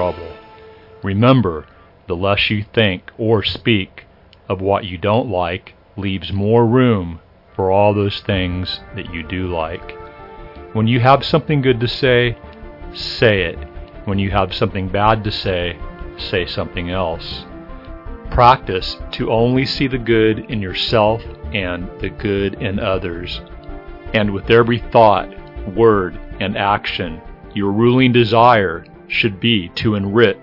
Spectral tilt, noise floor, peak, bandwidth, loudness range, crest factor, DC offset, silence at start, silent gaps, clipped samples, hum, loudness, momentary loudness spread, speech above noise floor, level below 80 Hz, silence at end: -8 dB/octave; -41 dBFS; 0 dBFS; 6 kHz; 5 LU; 18 dB; under 0.1%; 0 s; none; under 0.1%; none; -17 LUFS; 19 LU; 25 dB; -36 dBFS; 0.05 s